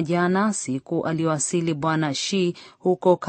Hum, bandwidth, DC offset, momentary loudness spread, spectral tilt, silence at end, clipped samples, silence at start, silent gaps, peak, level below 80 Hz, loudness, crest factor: none; 8.8 kHz; under 0.1%; 6 LU; -5 dB/octave; 0 s; under 0.1%; 0 s; none; -4 dBFS; -66 dBFS; -23 LUFS; 18 dB